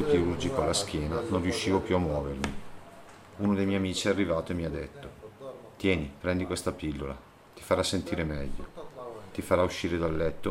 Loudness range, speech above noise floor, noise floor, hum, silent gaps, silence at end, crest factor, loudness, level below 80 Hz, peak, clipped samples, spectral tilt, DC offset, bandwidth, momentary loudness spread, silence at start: 3 LU; 20 dB; -49 dBFS; none; none; 0 s; 20 dB; -30 LUFS; -48 dBFS; -10 dBFS; under 0.1%; -5 dB/octave; under 0.1%; 16 kHz; 18 LU; 0 s